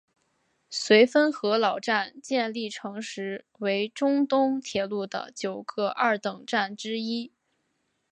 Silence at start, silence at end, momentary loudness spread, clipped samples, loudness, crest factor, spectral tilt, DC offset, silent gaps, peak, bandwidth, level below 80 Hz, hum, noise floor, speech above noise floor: 0.7 s; 0.85 s; 13 LU; under 0.1%; -26 LUFS; 22 dB; -4 dB/octave; under 0.1%; none; -6 dBFS; 9.6 kHz; -74 dBFS; none; -75 dBFS; 49 dB